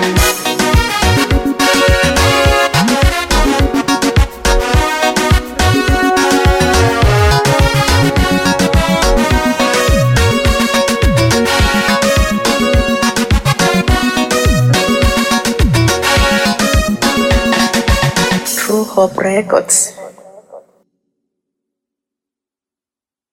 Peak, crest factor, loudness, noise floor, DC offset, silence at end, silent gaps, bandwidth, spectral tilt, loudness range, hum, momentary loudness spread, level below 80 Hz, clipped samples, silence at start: 0 dBFS; 12 dB; -12 LUFS; under -90 dBFS; under 0.1%; 2.75 s; none; 17 kHz; -4 dB/octave; 3 LU; none; 3 LU; -20 dBFS; under 0.1%; 0 s